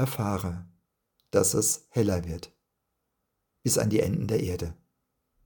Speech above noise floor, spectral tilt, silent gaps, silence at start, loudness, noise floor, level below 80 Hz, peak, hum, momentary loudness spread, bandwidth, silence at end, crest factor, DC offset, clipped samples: 53 dB; -5 dB/octave; none; 0 s; -27 LUFS; -80 dBFS; -54 dBFS; -8 dBFS; none; 14 LU; 19 kHz; 0.7 s; 22 dB; under 0.1%; under 0.1%